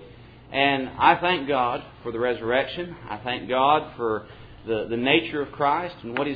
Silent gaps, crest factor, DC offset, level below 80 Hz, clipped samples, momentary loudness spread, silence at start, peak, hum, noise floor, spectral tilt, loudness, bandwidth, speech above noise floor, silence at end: none; 22 dB; under 0.1%; -52 dBFS; under 0.1%; 12 LU; 0 s; -4 dBFS; none; -46 dBFS; -8 dB/octave; -24 LUFS; 5 kHz; 22 dB; 0 s